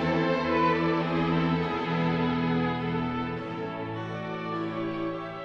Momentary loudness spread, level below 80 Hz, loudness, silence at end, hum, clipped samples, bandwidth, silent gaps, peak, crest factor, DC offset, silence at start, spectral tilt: 9 LU; -54 dBFS; -28 LUFS; 0 s; none; under 0.1%; 6.6 kHz; none; -14 dBFS; 14 dB; under 0.1%; 0 s; -8 dB/octave